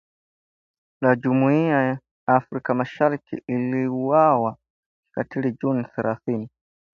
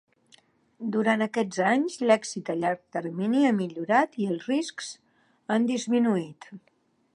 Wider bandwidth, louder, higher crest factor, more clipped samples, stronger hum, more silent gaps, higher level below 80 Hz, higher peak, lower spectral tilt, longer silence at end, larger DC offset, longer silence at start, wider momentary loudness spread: second, 6.6 kHz vs 11 kHz; first, -22 LUFS vs -26 LUFS; about the same, 20 dB vs 20 dB; neither; neither; first, 2.11-2.27 s, 4.70-5.03 s vs none; first, -66 dBFS vs -78 dBFS; about the same, -4 dBFS vs -6 dBFS; first, -9.5 dB/octave vs -5 dB/octave; about the same, 0.45 s vs 0.55 s; neither; first, 1 s vs 0.8 s; about the same, 11 LU vs 12 LU